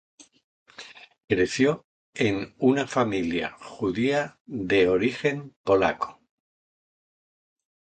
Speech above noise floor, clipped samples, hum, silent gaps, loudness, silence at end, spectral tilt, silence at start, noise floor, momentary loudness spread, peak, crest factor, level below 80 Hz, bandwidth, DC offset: 22 dB; under 0.1%; none; 1.24-1.28 s, 1.84-2.13 s, 4.40-4.45 s, 5.56-5.64 s; -25 LUFS; 1.8 s; -5.5 dB/octave; 0.8 s; -47 dBFS; 13 LU; -8 dBFS; 20 dB; -56 dBFS; 9.2 kHz; under 0.1%